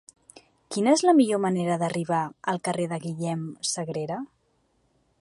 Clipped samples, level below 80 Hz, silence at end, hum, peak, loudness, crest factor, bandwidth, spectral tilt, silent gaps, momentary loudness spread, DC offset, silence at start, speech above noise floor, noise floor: under 0.1%; -72 dBFS; 0.95 s; none; -8 dBFS; -26 LUFS; 18 dB; 11.5 kHz; -5 dB/octave; none; 12 LU; under 0.1%; 0.7 s; 44 dB; -69 dBFS